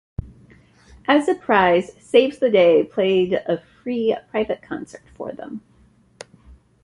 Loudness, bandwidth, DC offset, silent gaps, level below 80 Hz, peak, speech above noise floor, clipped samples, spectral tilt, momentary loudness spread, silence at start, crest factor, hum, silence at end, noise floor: -19 LUFS; 11 kHz; under 0.1%; none; -48 dBFS; -2 dBFS; 36 dB; under 0.1%; -6 dB/octave; 19 LU; 0.2 s; 18 dB; none; 1.25 s; -55 dBFS